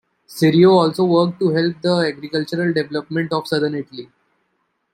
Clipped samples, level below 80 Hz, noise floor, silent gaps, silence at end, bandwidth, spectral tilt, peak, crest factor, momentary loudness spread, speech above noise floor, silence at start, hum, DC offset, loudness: under 0.1%; -62 dBFS; -69 dBFS; none; 0.9 s; 16 kHz; -7 dB/octave; -2 dBFS; 16 dB; 12 LU; 52 dB; 0.3 s; none; under 0.1%; -18 LUFS